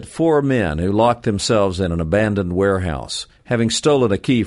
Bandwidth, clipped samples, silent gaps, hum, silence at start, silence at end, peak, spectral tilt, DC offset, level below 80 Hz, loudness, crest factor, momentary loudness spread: 11.5 kHz; under 0.1%; none; none; 0 s; 0 s; -2 dBFS; -5.5 dB/octave; under 0.1%; -38 dBFS; -18 LUFS; 14 dB; 7 LU